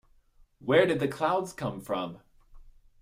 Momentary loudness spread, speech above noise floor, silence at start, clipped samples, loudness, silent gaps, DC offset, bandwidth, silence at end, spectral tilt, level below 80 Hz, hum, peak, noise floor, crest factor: 14 LU; 33 dB; 0.6 s; under 0.1%; -28 LUFS; none; under 0.1%; 16 kHz; 0.3 s; -6 dB/octave; -58 dBFS; none; -10 dBFS; -61 dBFS; 22 dB